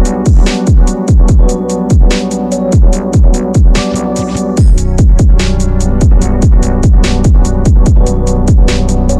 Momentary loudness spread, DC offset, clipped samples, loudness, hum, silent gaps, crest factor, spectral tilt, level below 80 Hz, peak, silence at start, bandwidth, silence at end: 5 LU; under 0.1%; under 0.1%; -10 LUFS; none; none; 6 dB; -6.5 dB/octave; -8 dBFS; 0 dBFS; 0 s; 11 kHz; 0 s